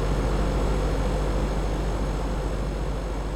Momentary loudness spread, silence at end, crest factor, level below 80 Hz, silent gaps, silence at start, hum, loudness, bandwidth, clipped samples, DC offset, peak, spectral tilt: 4 LU; 0 s; 12 dB; -26 dBFS; none; 0 s; none; -28 LUFS; 11.5 kHz; under 0.1%; under 0.1%; -14 dBFS; -6.5 dB/octave